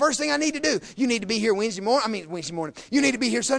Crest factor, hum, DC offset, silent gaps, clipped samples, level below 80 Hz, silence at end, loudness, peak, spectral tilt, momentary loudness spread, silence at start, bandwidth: 16 dB; none; under 0.1%; none; under 0.1%; -60 dBFS; 0 s; -24 LUFS; -8 dBFS; -3 dB/octave; 9 LU; 0 s; 10.5 kHz